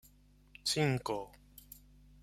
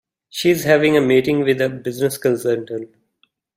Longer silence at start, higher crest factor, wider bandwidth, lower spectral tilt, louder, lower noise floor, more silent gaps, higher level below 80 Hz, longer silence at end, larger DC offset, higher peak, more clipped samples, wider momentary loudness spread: first, 0.65 s vs 0.35 s; first, 22 dB vs 16 dB; about the same, 16 kHz vs 16 kHz; about the same, -4.5 dB/octave vs -5.5 dB/octave; second, -35 LUFS vs -17 LUFS; about the same, -63 dBFS vs -64 dBFS; neither; about the same, -62 dBFS vs -58 dBFS; about the same, 0.65 s vs 0.7 s; neither; second, -18 dBFS vs -2 dBFS; neither; first, 23 LU vs 12 LU